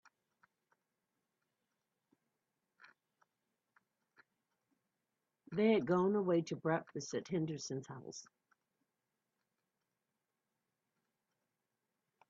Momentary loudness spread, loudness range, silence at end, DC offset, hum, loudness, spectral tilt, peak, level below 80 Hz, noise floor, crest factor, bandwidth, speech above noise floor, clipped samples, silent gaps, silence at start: 17 LU; 14 LU; 4.1 s; under 0.1%; none; -37 LUFS; -6 dB/octave; -20 dBFS; -84 dBFS; -89 dBFS; 22 dB; 7.4 kHz; 53 dB; under 0.1%; none; 5.5 s